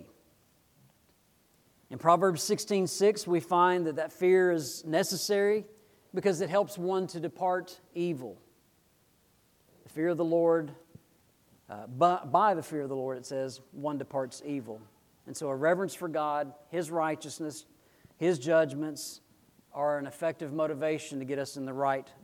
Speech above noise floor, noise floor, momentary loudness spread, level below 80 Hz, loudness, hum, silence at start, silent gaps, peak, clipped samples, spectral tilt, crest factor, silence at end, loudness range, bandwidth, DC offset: 38 dB; -67 dBFS; 14 LU; -78 dBFS; -30 LUFS; none; 0 s; none; -8 dBFS; under 0.1%; -5 dB/octave; 22 dB; 0.15 s; 7 LU; 17.5 kHz; under 0.1%